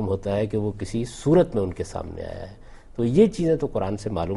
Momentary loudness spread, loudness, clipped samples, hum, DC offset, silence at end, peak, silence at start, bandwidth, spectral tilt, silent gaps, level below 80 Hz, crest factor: 16 LU; -24 LUFS; under 0.1%; none; under 0.1%; 0 s; -6 dBFS; 0 s; 11.5 kHz; -7.5 dB/octave; none; -44 dBFS; 18 dB